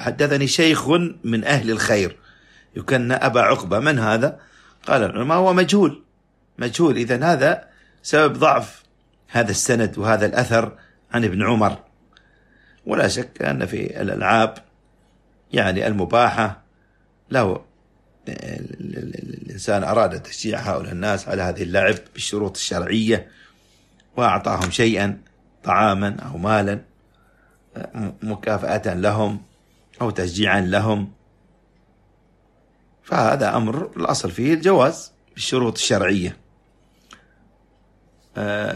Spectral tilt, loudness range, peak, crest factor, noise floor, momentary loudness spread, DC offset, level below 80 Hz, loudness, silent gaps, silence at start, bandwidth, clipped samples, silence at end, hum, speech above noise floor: -5 dB/octave; 6 LU; 0 dBFS; 20 dB; -60 dBFS; 15 LU; under 0.1%; -52 dBFS; -20 LUFS; none; 0 s; 13.5 kHz; under 0.1%; 0 s; none; 41 dB